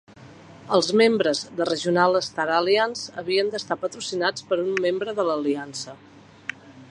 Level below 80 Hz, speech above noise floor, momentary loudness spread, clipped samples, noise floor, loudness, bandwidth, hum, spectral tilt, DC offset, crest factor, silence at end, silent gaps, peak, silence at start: -68 dBFS; 23 dB; 15 LU; under 0.1%; -46 dBFS; -23 LUFS; 11.5 kHz; none; -4 dB/octave; under 0.1%; 20 dB; 0.05 s; none; -4 dBFS; 0.2 s